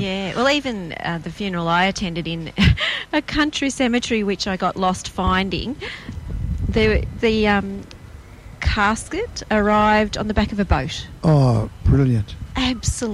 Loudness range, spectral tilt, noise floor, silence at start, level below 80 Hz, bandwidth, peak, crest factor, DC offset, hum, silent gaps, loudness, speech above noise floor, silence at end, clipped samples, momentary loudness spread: 3 LU; -5.5 dB/octave; -40 dBFS; 0 s; -30 dBFS; 13 kHz; -2 dBFS; 18 dB; under 0.1%; none; none; -20 LUFS; 20 dB; 0 s; under 0.1%; 10 LU